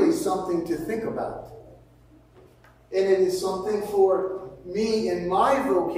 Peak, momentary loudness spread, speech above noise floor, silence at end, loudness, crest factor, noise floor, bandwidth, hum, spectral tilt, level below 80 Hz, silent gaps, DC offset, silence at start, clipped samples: -8 dBFS; 11 LU; 30 dB; 0 s; -25 LUFS; 16 dB; -54 dBFS; 16 kHz; none; -5.5 dB/octave; -56 dBFS; none; under 0.1%; 0 s; under 0.1%